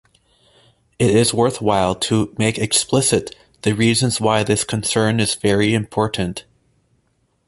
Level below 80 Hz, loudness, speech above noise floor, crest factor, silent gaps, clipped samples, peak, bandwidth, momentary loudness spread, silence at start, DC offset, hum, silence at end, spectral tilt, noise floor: -46 dBFS; -18 LUFS; 47 dB; 18 dB; none; under 0.1%; -2 dBFS; 12 kHz; 7 LU; 1 s; under 0.1%; none; 1.05 s; -4.5 dB/octave; -64 dBFS